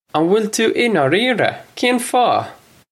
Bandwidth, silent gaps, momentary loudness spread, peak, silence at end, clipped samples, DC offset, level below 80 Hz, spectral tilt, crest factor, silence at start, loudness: 16 kHz; none; 5 LU; 0 dBFS; 0.4 s; under 0.1%; under 0.1%; -64 dBFS; -4 dB/octave; 16 dB; 0.15 s; -16 LUFS